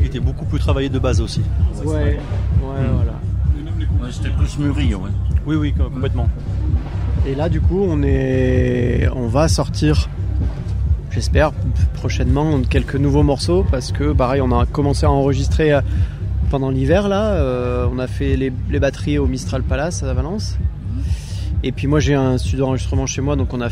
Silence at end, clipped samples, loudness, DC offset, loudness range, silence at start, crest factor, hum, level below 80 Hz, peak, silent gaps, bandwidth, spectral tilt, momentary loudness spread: 0 s; under 0.1%; -19 LUFS; under 0.1%; 3 LU; 0 s; 14 dB; none; -22 dBFS; -4 dBFS; none; 11 kHz; -7 dB/octave; 6 LU